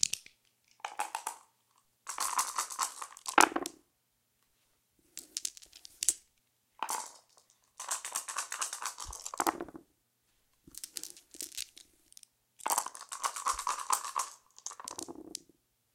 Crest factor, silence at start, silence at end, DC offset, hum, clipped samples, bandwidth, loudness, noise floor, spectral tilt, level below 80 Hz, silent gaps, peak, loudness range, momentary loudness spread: 36 dB; 0 s; 0.55 s; under 0.1%; none; under 0.1%; 17 kHz; -35 LUFS; -77 dBFS; 0.5 dB/octave; -68 dBFS; none; -2 dBFS; 7 LU; 15 LU